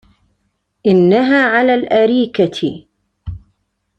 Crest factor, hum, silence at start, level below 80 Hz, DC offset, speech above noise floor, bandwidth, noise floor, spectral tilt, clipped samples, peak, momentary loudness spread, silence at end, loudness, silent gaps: 14 dB; none; 0.85 s; -44 dBFS; under 0.1%; 55 dB; 8.6 kHz; -67 dBFS; -7 dB/octave; under 0.1%; -2 dBFS; 21 LU; 0.6 s; -13 LUFS; none